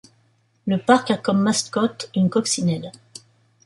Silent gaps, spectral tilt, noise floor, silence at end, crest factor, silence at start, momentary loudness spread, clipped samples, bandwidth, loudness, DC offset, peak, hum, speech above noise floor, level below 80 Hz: none; -4.5 dB/octave; -62 dBFS; 0.75 s; 18 dB; 0.65 s; 13 LU; under 0.1%; 11.5 kHz; -21 LUFS; under 0.1%; -4 dBFS; none; 42 dB; -64 dBFS